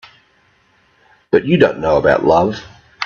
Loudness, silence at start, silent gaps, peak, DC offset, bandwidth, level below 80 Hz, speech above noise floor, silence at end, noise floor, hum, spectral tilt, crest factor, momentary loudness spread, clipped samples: -14 LUFS; 1.35 s; none; 0 dBFS; under 0.1%; 7 kHz; -44 dBFS; 43 dB; 0 s; -56 dBFS; none; -7 dB/octave; 16 dB; 7 LU; under 0.1%